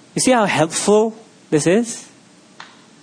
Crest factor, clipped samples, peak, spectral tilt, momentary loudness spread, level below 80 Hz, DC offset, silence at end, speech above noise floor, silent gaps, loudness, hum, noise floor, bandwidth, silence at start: 16 dB; under 0.1%; -2 dBFS; -4 dB/octave; 9 LU; -60 dBFS; under 0.1%; 0.4 s; 28 dB; none; -17 LUFS; none; -44 dBFS; 10.5 kHz; 0.15 s